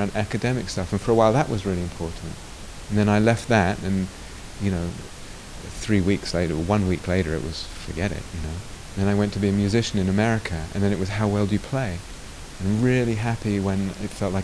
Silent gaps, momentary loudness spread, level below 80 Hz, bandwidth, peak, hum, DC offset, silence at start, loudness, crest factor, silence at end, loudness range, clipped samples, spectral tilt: none; 16 LU; -40 dBFS; 11 kHz; -4 dBFS; none; 0.3%; 0 s; -24 LUFS; 20 dB; 0 s; 3 LU; under 0.1%; -6 dB/octave